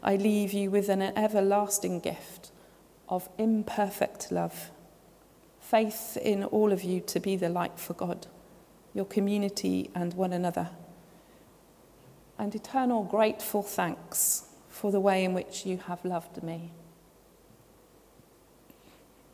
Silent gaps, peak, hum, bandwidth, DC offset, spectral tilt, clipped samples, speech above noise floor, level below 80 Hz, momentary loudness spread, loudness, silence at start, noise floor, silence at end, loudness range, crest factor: none; -10 dBFS; none; 16 kHz; under 0.1%; -5 dB/octave; under 0.1%; 30 dB; -66 dBFS; 14 LU; -30 LUFS; 0 s; -59 dBFS; 2.5 s; 6 LU; 20 dB